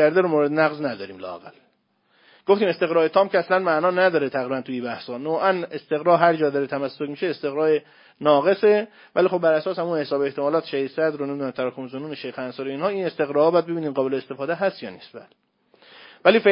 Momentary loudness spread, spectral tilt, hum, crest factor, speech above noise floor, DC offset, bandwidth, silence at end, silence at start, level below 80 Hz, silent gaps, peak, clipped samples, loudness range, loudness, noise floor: 13 LU; -10 dB/octave; none; 22 dB; 44 dB; under 0.1%; 5.4 kHz; 0 s; 0 s; -74 dBFS; none; 0 dBFS; under 0.1%; 4 LU; -22 LUFS; -66 dBFS